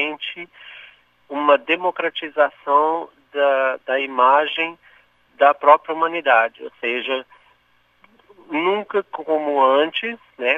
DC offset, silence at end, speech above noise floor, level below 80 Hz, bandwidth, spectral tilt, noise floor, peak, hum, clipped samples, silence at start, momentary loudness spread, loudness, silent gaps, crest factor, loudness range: under 0.1%; 0 s; 42 dB; -74 dBFS; 3.9 kHz; -5 dB/octave; -61 dBFS; 0 dBFS; 60 Hz at -70 dBFS; under 0.1%; 0 s; 13 LU; -19 LUFS; none; 20 dB; 4 LU